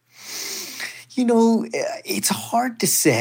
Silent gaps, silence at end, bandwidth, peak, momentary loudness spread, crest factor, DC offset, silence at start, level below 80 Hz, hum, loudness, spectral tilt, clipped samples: none; 0 s; 17 kHz; -4 dBFS; 13 LU; 16 dB; under 0.1%; 0.2 s; -78 dBFS; none; -21 LUFS; -3.5 dB/octave; under 0.1%